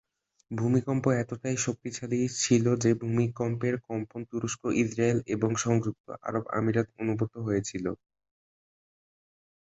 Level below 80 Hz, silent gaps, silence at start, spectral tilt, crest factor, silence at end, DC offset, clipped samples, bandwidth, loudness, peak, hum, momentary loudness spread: -60 dBFS; 6.00-6.04 s; 0.5 s; -5.5 dB/octave; 20 dB; 1.75 s; under 0.1%; under 0.1%; 8.2 kHz; -29 LUFS; -10 dBFS; none; 10 LU